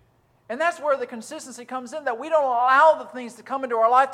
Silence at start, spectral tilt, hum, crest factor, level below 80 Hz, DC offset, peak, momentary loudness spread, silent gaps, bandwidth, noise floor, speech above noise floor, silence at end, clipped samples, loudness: 0.5 s; -2.5 dB/octave; none; 18 dB; -76 dBFS; under 0.1%; -4 dBFS; 19 LU; none; 13 kHz; -55 dBFS; 33 dB; 0 s; under 0.1%; -21 LUFS